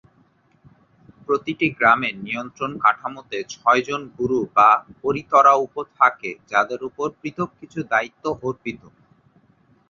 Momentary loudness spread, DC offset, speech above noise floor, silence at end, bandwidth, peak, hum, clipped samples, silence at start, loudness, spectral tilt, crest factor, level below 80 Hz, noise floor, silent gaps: 15 LU; under 0.1%; 38 dB; 1.15 s; 7.2 kHz; -2 dBFS; none; under 0.1%; 1.3 s; -20 LUFS; -5 dB/octave; 20 dB; -60 dBFS; -59 dBFS; none